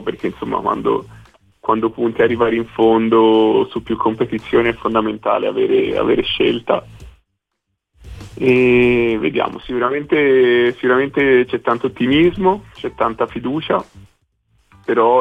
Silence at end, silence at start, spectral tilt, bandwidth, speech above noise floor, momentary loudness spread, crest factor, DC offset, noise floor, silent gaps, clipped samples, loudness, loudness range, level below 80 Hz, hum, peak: 0 s; 0 s; -7.5 dB/octave; 5.6 kHz; 59 dB; 9 LU; 14 dB; under 0.1%; -75 dBFS; none; under 0.1%; -16 LUFS; 4 LU; -44 dBFS; none; -2 dBFS